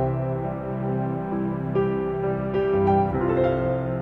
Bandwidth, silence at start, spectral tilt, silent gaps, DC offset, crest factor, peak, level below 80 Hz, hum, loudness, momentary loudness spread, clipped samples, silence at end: 4.3 kHz; 0 s; -10.5 dB/octave; none; 0.1%; 14 dB; -10 dBFS; -44 dBFS; none; -24 LUFS; 7 LU; under 0.1%; 0 s